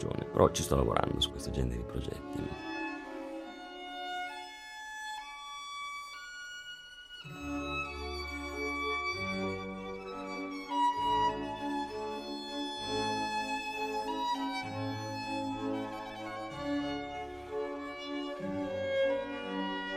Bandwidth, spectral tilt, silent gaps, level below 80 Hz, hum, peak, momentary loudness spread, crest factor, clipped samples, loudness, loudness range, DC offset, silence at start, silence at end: 16 kHz; -4.5 dB/octave; none; -50 dBFS; none; -10 dBFS; 13 LU; 26 dB; under 0.1%; -36 LUFS; 8 LU; under 0.1%; 0 s; 0 s